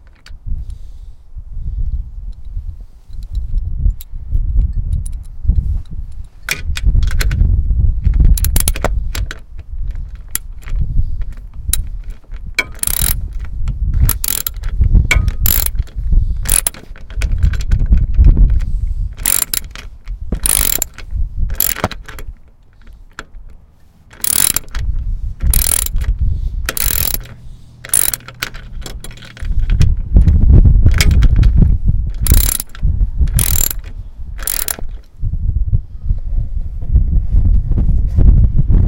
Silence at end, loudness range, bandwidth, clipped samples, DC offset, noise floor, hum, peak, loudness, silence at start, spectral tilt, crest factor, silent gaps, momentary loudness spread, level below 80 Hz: 0 s; 9 LU; 17.5 kHz; 0.2%; under 0.1%; -43 dBFS; none; 0 dBFS; -16 LUFS; 0.05 s; -3.5 dB/octave; 14 dB; none; 19 LU; -16 dBFS